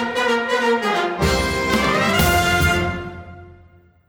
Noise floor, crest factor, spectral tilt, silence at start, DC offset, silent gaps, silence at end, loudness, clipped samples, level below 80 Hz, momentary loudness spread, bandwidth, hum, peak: -50 dBFS; 16 dB; -4.5 dB/octave; 0 s; under 0.1%; none; 0.6 s; -18 LUFS; under 0.1%; -32 dBFS; 9 LU; over 20 kHz; none; -4 dBFS